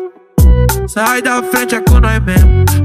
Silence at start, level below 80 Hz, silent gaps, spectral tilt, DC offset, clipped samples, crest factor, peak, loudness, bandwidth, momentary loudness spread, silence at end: 0 s; -12 dBFS; none; -5.5 dB/octave; under 0.1%; under 0.1%; 10 dB; 0 dBFS; -11 LUFS; 16 kHz; 5 LU; 0 s